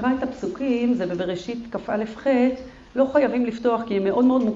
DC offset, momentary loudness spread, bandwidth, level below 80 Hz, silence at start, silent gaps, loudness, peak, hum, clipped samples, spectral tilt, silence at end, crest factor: under 0.1%; 10 LU; 7.6 kHz; -52 dBFS; 0 s; none; -23 LUFS; -8 dBFS; none; under 0.1%; -7 dB/octave; 0 s; 16 dB